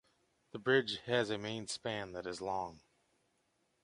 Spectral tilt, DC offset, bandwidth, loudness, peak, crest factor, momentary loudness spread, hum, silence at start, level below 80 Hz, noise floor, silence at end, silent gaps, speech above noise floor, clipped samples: -4 dB/octave; under 0.1%; 11.5 kHz; -37 LUFS; -16 dBFS; 22 dB; 11 LU; none; 0.55 s; -72 dBFS; -78 dBFS; 1.05 s; none; 42 dB; under 0.1%